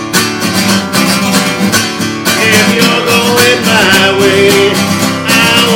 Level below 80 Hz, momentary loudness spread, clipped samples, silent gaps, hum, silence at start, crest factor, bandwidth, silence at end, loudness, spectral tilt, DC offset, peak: -44 dBFS; 5 LU; 2%; none; none; 0 s; 8 dB; over 20 kHz; 0 s; -8 LUFS; -3 dB/octave; under 0.1%; 0 dBFS